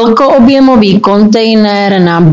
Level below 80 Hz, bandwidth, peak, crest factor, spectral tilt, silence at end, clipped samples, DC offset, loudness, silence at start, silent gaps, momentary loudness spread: -38 dBFS; 7.6 kHz; 0 dBFS; 6 dB; -7 dB/octave; 0 s; 6%; under 0.1%; -6 LUFS; 0 s; none; 3 LU